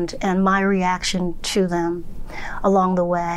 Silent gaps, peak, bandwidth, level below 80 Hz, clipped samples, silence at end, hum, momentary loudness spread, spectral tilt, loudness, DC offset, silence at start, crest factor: none; -8 dBFS; 12.5 kHz; -36 dBFS; under 0.1%; 0 s; none; 14 LU; -5 dB/octave; -20 LUFS; under 0.1%; 0 s; 12 dB